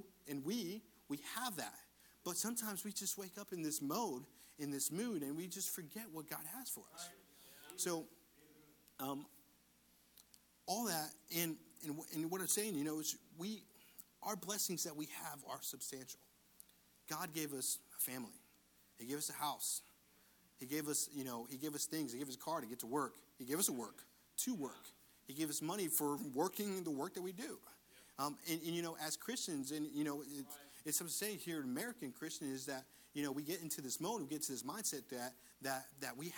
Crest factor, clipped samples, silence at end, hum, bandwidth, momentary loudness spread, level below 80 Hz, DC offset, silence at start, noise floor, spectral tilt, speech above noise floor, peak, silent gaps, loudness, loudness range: 24 dB; under 0.1%; 0 s; none; 19.5 kHz; 14 LU; -84 dBFS; under 0.1%; 0 s; -72 dBFS; -3 dB/octave; 28 dB; -22 dBFS; none; -43 LUFS; 4 LU